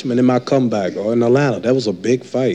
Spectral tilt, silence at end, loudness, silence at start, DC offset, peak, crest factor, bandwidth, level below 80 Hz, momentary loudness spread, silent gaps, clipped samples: -7 dB/octave; 0 s; -17 LUFS; 0 s; 0.1%; -4 dBFS; 12 dB; 9 kHz; -64 dBFS; 4 LU; none; under 0.1%